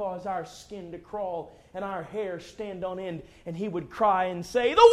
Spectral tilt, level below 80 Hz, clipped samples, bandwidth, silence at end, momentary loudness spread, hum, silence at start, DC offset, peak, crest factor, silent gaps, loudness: -5 dB/octave; -58 dBFS; under 0.1%; 13 kHz; 0 s; 16 LU; none; 0 s; under 0.1%; -4 dBFS; 22 dB; none; -29 LUFS